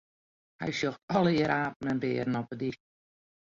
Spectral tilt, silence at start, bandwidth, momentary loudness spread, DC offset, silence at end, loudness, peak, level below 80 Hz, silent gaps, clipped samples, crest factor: -6.5 dB/octave; 0.6 s; 7.6 kHz; 11 LU; under 0.1%; 0.85 s; -30 LUFS; -14 dBFS; -64 dBFS; 1.03-1.08 s, 1.76-1.80 s; under 0.1%; 18 dB